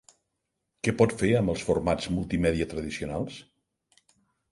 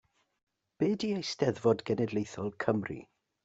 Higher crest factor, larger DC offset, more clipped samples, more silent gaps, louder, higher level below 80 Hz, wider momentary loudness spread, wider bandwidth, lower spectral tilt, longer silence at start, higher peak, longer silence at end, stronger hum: about the same, 22 dB vs 22 dB; neither; neither; neither; first, -27 LUFS vs -32 LUFS; first, -46 dBFS vs -68 dBFS; about the same, 9 LU vs 8 LU; first, 11.5 kHz vs 8 kHz; about the same, -6 dB/octave vs -6 dB/octave; about the same, 0.85 s vs 0.8 s; first, -6 dBFS vs -12 dBFS; first, 1.1 s vs 0.4 s; neither